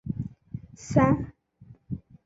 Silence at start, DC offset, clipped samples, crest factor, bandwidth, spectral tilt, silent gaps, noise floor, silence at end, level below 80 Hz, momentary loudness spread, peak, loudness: 0.05 s; under 0.1%; under 0.1%; 22 dB; 8 kHz; -8 dB/octave; none; -54 dBFS; 0.3 s; -48 dBFS; 19 LU; -8 dBFS; -26 LUFS